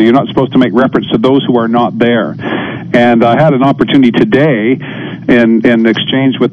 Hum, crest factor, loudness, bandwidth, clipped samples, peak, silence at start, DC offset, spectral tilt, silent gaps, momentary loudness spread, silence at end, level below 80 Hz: none; 8 dB; -9 LUFS; 6.4 kHz; 2%; 0 dBFS; 0 s; under 0.1%; -8 dB/octave; none; 8 LU; 0 s; -44 dBFS